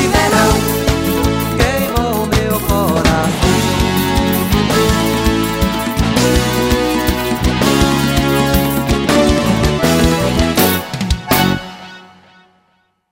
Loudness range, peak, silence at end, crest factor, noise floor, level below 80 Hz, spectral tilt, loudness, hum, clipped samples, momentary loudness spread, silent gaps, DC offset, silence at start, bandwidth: 1 LU; 0 dBFS; 1.05 s; 14 dB; -59 dBFS; -24 dBFS; -5 dB/octave; -14 LUFS; none; under 0.1%; 4 LU; none; under 0.1%; 0 s; 16.5 kHz